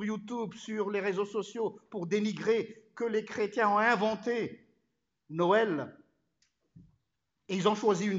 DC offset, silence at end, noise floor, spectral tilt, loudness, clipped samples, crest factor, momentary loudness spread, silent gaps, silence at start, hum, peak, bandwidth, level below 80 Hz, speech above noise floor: under 0.1%; 0 s; -83 dBFS; -5.5 dB/octave; -31 LUFS; under 0.1%; 20 dB; 11 LU; none; 0 s; none; -12 dBFS; 7.8 kHz; -78 dBFS; 53 dB